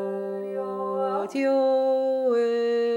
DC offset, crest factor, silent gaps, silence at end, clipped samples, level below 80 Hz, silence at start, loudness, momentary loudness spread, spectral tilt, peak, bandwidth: under 0.1%; 10 dB; none; 0 s; under 0.1%; -82 dBFS; 0 s; -25 LUFS; 9 LU; -6 dB/octave; -14 dBFS; 10.5 kHz